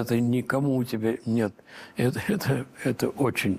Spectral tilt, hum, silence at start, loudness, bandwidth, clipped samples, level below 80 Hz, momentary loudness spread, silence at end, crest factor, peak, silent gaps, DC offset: -6.5 dB/octave; none; 0 s; -27 LUFS; 15.5 kHz; under 0.1%; -62 dBFS; 5 LU; 0 s; 14 dB; -12 dBFS; none; under 0.1%